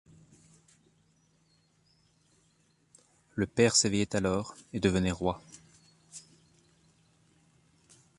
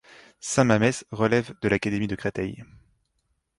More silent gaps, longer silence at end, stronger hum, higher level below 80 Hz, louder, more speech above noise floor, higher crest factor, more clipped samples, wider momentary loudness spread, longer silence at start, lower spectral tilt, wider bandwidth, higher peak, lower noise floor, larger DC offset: neither; first, 2 s vs 0.95 s; neither; about the same, -54 dBFS vs -52 dBFS; second, -29 LUFS vs -25 LUFS; second, 40 dB vs 50 dB; about the same, 24 dB vs 20 dB; neither; first, 26 LU vs 13 LU; first, 3.35 s vs 0.45 s; second, -4 dB/octave vs -5.5 dB/octave; about the same, 11.5 kHz vs 11.5 kHz; second, -10 dBFS vs -6 dBFS; second, -69 dBFS vs -74 dBFS; neither